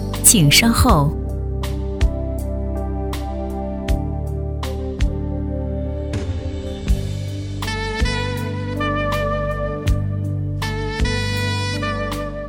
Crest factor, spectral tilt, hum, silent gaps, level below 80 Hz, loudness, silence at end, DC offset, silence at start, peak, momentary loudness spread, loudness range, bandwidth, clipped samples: 20 dB; -4 dB/octave; none; none; -26 dBFS; -20 LUFS; 0 s; under 0.1%; 0 s; 0 dBFS; 12 LU; 6 LU; 17 kHz; under 0.1%